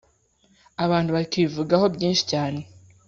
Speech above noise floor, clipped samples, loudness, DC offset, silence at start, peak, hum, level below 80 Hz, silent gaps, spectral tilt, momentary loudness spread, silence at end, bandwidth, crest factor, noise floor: 40 dB; under 0.1%; -23 LUFS; under 0.1%; 0.8 s; -6 dBFS; none; -56 dBFS; none; -5.5 dB/octave; 9 LU; 0.45 s; 7.6 kHz; 18 dB; -62 dBFS